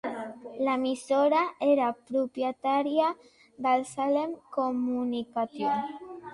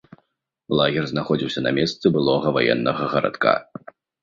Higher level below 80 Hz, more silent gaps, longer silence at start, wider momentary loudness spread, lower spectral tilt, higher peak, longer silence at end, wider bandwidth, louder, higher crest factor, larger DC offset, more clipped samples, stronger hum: second, -74 dBFS vs -56 dBFS; neither; second, 0.05 s vs 0.7 s; first, 9 LU vs 5 LU; second, -4.5 dB/octave vs -6.5 dB/octave; second, -14 dBFS vs -2 dBFS; second, 0 s vs 0.6 s; first, 11.5 kHz vs 7.6 kHz; second, -28 LUFS vs -21 LUFS; about the same, 16 dB vs 20 dB; neither; neither; neither